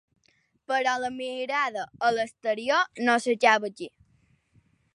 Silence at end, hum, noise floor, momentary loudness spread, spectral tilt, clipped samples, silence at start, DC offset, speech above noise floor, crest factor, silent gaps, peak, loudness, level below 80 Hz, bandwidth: 1.05 s; none; -68 dBFS; 11 LU; -2.5 dB/octave; under 0.1%; 0.7 s; under 0.1%; 42 dB; 22 dB; none; -6 dBFS; -26 LUFS; -72 dBFS; 11.5 kHz